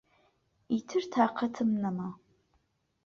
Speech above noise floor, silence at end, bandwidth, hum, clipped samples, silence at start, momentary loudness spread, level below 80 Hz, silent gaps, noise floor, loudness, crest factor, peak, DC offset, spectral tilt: 44 dB; 0.9 s; 7 kHz; none; under 0.1%; 0.7 s; 8 LU; -72 dBFS; none; -74 dBFS; -31 LUFS; 20 dB; -12 dBFS; under 0.1%; -6.5 dB/octave